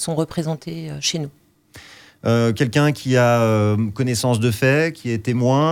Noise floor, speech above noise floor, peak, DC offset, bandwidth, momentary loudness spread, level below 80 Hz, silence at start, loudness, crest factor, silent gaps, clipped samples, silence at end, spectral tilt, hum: -46 dBFS; 27 dB; -4 dBFS; under 0.1%; 16.5 kHz; 10 LU; -56 dBFS; 0 s; -19 LUFS; 14 dB; none; under 0.1%; 0 s; -5.5 dB/octave; none